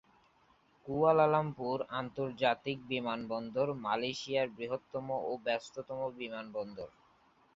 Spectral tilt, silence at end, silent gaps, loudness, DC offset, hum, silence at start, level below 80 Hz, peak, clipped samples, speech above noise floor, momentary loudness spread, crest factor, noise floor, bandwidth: -4 dB/octave; 0.65 s; none; -35 LUFS; under 0.1%; none; 0.85 s; -72 dBFS; -14 dBFS; under 0.1%; 34 dB; 13 LU; 22 dB; -68 dBFS; 7.6 kHz